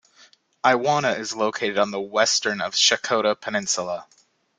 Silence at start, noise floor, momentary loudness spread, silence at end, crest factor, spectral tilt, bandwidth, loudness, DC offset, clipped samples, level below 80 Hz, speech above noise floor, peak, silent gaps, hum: 0.65 s; -55 dBFS; 7 LU; 0.55 s; 20 dB; -1.5 dB/octave; 11 kHz; -21 LUFS; under 0.1%; under 0.1%; -68 dBFS; 33 dB; -2 dBFS; none; none